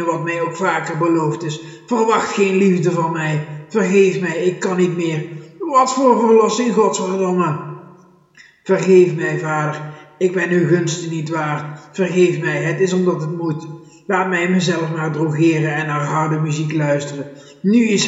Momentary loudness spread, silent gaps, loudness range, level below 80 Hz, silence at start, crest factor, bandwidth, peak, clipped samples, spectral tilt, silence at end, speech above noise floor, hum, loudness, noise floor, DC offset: 12 LU; none; 3 LU; -70 dBFS; 0 s; 16 dB; 8 kHz; 0 dBFS; under 0.1%; -6 dB/octave; 0 s; 32 dB; none; -17 LUFS; -48 dBFS; under 0.1%